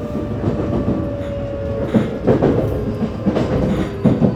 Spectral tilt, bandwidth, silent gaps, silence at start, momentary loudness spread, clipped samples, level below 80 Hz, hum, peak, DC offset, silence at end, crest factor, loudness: -9 dB/octave; 12.5 kHz; none; 0 s; 8 LU; under 0.1%; -32 dBFS; none; 0 dBFS; under 0.1%; 0 s; 18 dB; -19 LUFS